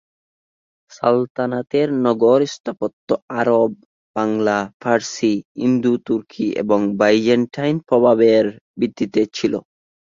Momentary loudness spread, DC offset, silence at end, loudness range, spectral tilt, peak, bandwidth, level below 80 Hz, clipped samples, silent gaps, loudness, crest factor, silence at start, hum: 9 LU; under 0.1%; 0.55 s; 3 LU; -6 dB/octave; -2 dBFS; 7.6 kHz; -60 dBFS; under 0.1%; 1.30-1.35 s, 2.60-2.64 s, 2.93-3.08 s, 3.22-3.28 s, 3.85-4.14 s, 4.74-4.80 s, 5.45-5.55 s, 8.61-8.74 s; -18 LUFS; 16 dB; 1 s; none